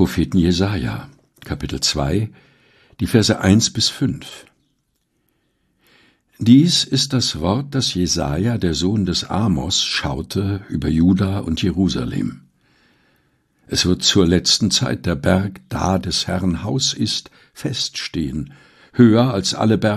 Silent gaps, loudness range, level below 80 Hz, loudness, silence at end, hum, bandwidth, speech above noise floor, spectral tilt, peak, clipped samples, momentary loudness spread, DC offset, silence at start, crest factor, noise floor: none; 4 LU; -38 dBFS; -18 LUFS; 0 s; none; 13.5 kHz; 50 dB; -4.5 dB/octave; 0 dBFS; under 0.1%; 12 LU; under 0.1%; 0 s; 18 dB; -68 dBFS